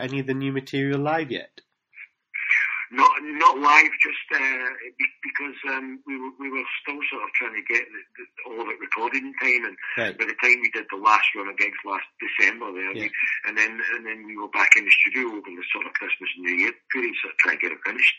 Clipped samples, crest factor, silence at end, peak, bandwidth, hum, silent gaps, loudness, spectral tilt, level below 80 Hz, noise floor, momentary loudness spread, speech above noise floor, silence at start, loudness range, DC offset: under 0.1%; 24 dB; 0 s; 0 dBFS; 8 kHz; none; none; -22 LUFS; -1.5 dB/octave; -76 dBFS; -48 dBFS; 15 LU; 24 dB; 0 s; 7 LU; under 0.1%